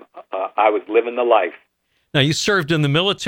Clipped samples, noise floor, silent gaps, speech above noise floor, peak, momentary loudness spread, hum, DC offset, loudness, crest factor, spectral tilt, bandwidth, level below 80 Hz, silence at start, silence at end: under 0.1%; -67 dBFS; none; 50 dB; -2 dBFS; 9 LU; none; under 0.1%; -18 LUFS; 18 dB; -4.5 dB/octave; 16.5 kHz; -56 dBFS; 0.15 s; 0 s